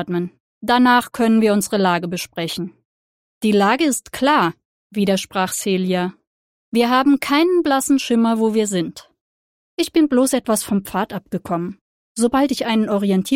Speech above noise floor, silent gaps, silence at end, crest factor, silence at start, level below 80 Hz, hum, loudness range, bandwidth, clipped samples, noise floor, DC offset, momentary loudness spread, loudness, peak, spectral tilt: over 72 dB; 0.40-0.61 s, 2.85-3.41 s, 4.65-4.90 s, 6.27-6.72 s, 9.21-9.77 s, 11.81-12.15 s; 0 s; 16 dB; 0 s; -56 dBFS; none; 2 LU; 16.5 kHz; under 0.1%; under -90 dBFS; under 0.1%; 10 LU; -18 LUFS; -2 dBFS; -4.5 dB/octave